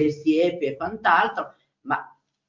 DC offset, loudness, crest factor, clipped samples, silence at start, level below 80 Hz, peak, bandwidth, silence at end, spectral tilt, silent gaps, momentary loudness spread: under 0.1%; -23 LUFS; 20 dB; under 0.1%; 0 s; -62 dBFS; -4 dBFS; 7.6 kHz; 0.45 s; -6 dB/octave; none; 14 LU